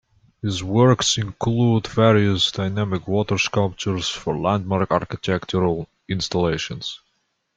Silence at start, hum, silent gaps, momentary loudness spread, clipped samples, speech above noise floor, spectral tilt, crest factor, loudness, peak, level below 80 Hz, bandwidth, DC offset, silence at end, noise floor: 0.45 s; none; none; 11 LU; under 0.1%; 50 dB; -5 dB/octave; 18 dB; -21 LUFS; -4 dBFS; -50 dBFS; 9.2 kHz; under 0.1%; 0.6 s; -70 dBFS